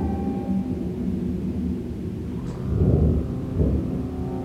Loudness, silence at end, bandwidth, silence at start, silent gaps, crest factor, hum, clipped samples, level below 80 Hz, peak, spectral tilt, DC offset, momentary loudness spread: -25 LUFS; 0 s; 8.4 kHz; 0 s; none; 18 dB; none; under 0.1%; -32 dBFS; -6 dBFS; -10 dB/octave; under 0.1%; 9 LU